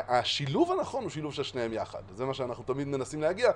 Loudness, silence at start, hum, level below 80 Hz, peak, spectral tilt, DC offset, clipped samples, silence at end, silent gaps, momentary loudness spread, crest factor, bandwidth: -31 LUFS; 0 s; none; -58 dBFS; -12 dBFS; -5 dB/octave; under 0.1%; under 0.1%; 0 s; none; 8 LU; 20 dB; 11 kHz